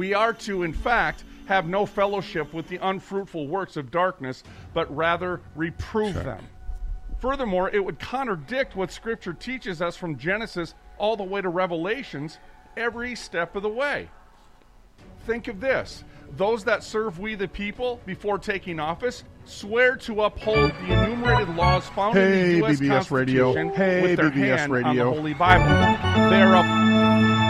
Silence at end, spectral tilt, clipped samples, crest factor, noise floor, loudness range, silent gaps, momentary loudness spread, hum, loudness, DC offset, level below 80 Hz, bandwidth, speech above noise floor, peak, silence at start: 0 s; -6.5 dB/octave; under 0.1%; 22 dB; -52 dBFS; 9 LU; none; 14 LU; none; -23 LUFS; under 0.1%; -40 dBFS; 12 kHz; 29 dB; -2 dBFS; 0 s